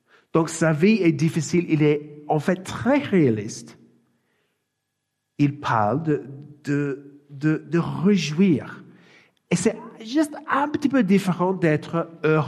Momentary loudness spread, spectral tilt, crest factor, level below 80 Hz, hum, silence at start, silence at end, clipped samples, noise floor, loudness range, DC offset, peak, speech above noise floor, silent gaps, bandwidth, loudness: 8 LU; -6.5 dB/octave; 18 dB; -64 dBFS; none; 0.35 s; 0 s; under 0.1%; -78 dBFS; 5 LU; under 0.1%; -6 dBFS; 57 dB; none; 13 kHz; -22 LUFS